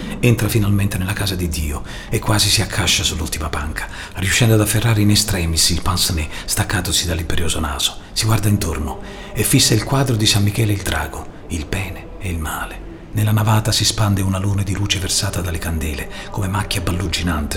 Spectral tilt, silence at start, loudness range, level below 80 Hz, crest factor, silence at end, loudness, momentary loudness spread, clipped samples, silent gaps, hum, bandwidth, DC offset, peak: -4 dB/octave; 0 s; 4 LU; -30 dBFS; 18 dB; 0 s; -18 LUFS; 13 LU; under 0.1%; none; none; 17.5 kHz; under 0.1%; 0 dBFS